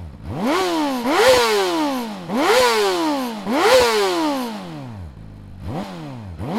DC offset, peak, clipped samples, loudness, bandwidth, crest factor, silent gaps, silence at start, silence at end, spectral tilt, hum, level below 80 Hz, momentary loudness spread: under 0.1%; -2 dBFS; under 0.1%; -18 LUFS; 17 kHz; 18 dB; none; 0 s; 0 s; -3.5 dB/octave; none; -48 dBFS; 19 LU